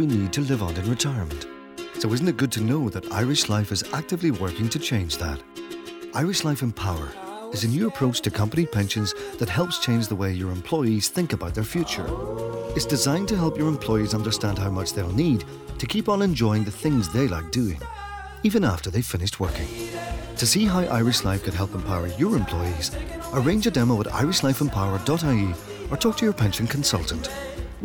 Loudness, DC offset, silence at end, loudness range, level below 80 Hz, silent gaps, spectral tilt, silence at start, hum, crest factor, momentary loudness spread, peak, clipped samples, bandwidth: -24 LUFS; under 0.1%; 0 s; 3 LU; -40 dBFS; none; -5 dB/octave; 0 s; none; 14 dB; 10 LU; -10 dBFS; under 0.1%; over 20 kHz